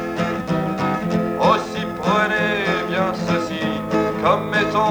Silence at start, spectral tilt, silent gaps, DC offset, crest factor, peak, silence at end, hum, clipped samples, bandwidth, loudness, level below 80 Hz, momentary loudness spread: 0 s; -6 dB/octave; none; under 0.1%; 16 dB; -2 dBFS; 0 s; none; under 0.1%; over 20 kHz; -20 LUFS; -46 dBFS; 5 LU